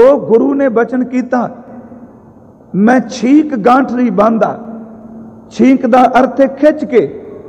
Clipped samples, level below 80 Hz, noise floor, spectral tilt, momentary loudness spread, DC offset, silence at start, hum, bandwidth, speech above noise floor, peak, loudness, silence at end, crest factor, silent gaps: under 0.1%; -50 dBFS; -39 dBFS; -7 dB/octave; 17 LU; under 0.1%; 0 s; none; 8.6 kHz; 29 dB; 0 dBFS; -11 LUFS; 0 s; 12 dB; none